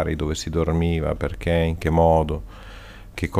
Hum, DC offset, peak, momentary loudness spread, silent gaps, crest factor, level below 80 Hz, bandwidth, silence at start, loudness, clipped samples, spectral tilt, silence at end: none; under 0.1%; -6 dBFS; 23 LU; none; 16 dB; -32 dBFS; 15 kHz; 0 s; -22 LUFS; under 0.1%; -6.5 dB/octave; 0 s